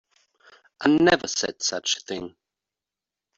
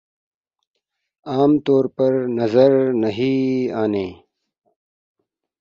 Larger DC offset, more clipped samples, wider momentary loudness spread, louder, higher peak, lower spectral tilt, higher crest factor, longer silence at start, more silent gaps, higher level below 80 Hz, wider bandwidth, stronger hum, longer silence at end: neither; neither; first, 15 LU vs 8 LU; second, -23 LUFS vs -18 LUFS; about the same, -4 dBFS vs -2 dBFS; second, -3 dB/octave vs -8.5 dB/octave; about the same, 22 dB vs 18 dB; second, 0.8 s vs 1.25 s; neither; about the same, -60 dBFS vs -58 dBFS; first, 8 kHz vs 6.8 kHz; neither; second, 1.1 s vs 1.45 s